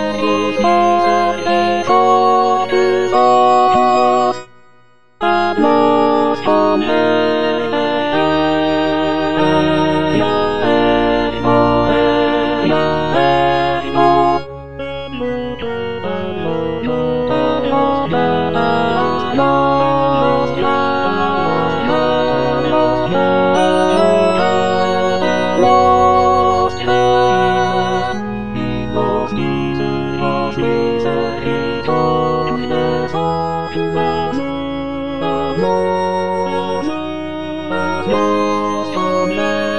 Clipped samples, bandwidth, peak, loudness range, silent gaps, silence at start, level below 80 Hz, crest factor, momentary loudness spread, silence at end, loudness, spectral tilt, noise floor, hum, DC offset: under 0.1%; 10.5 kHz; 0 dBFS; 5 LU; none; 0 s; -40 dBFS; 14 dB; 9 LU; 0 s; -15 LUFS; -6 dB/octave; -51 dBFS; none; 3%